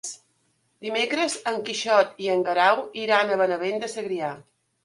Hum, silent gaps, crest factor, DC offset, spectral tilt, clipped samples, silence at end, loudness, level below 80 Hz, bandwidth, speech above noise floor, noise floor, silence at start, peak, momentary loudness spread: none; none; 18 dB; under 0.1%; -2.5 dB/octave; under 0.1%; 0.45 s; -24 LUFS; -76 dBFS; 11.5 kHz; 45 dB; -69 dBFS; 0.05 s; -6 dBFS; 12 LU